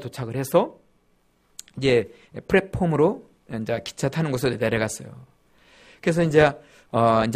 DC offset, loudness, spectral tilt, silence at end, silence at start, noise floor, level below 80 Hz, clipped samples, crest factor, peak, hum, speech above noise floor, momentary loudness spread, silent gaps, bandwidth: under 0.1%; -23 LUFS; -6 dB/octave; 0 s; 0 s; -64 dBFS; -50 dBFS; under 0.1%; 20 dB; -4 dBFS; none; 41 dB; 18 LU; none; 15.5 kHz